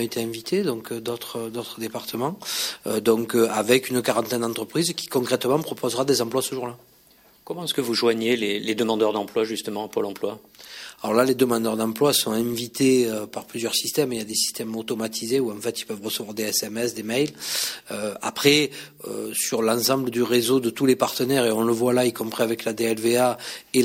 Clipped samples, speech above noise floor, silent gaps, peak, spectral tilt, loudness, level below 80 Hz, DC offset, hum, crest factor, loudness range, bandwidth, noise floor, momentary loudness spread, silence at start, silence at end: under 0.1%; 32 dB; none; -4 dBFS; -3.5 dB/octave; -23 LUFS; -66 dBFS; under 0.1%; none; 20 dB; 4 LU; 16.5 kHz; -55 dBFS; 10 LU; 0 s; 0 s